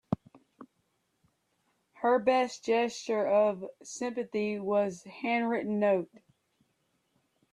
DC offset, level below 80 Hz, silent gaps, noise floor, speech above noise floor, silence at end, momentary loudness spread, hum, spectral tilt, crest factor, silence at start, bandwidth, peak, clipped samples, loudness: under 0.1%; -72 dBFS; none; -76 dBFS; 47 dB; 1.5 s; 11 LU; none; -5 dB/octave; 20 dB; 0.1 s; 11 kHz; -12 dBFS; under 0.1%; -30 LUFS